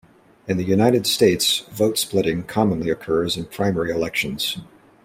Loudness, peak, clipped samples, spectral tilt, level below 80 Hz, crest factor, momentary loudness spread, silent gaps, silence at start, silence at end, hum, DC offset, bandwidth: -20 LUFS; -2 dBFS; under 0.1%; -4.5 dB/octave; -52 dBFS; 20 dB; 8 LU; none; 0.45 s; 0.4 s; none; under 0.1%; 16.5 kHz